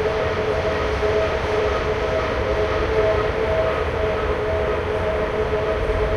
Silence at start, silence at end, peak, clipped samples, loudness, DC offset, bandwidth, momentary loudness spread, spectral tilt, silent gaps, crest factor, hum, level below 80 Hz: 0 s; 0 s; -6 dBFS; under 0.1%; -21 LUFS; under 0.1%; 11 kHz; 2 LU; -6 dB/octave; none; 14 dB; none; -30 dBFS